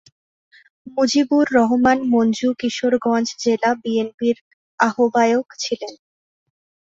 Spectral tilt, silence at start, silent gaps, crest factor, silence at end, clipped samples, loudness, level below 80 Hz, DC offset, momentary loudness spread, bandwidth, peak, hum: -4 dB/octave; 0.85 s; 4.14-4.18 s, 4.41-4.78 s; 18 dB; 0.9 s; under 0.1%; -19 LUFS; -58 dBFS; under 0.1%; 9 LU; 7.8 kHz; -2 dBFS; none